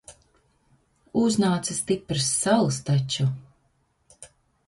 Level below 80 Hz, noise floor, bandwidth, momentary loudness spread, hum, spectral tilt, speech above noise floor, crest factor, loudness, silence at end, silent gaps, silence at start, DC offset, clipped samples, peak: -58 dBFS; -68 dBFS; 11.5 kHz; 6 LU; none; -4.5 dB/octave; 45 dB; 20 dB; -24 LUFS; 0.4 s; none; 0.1 s; under 0.1%; under 0.1%; -6 dBFS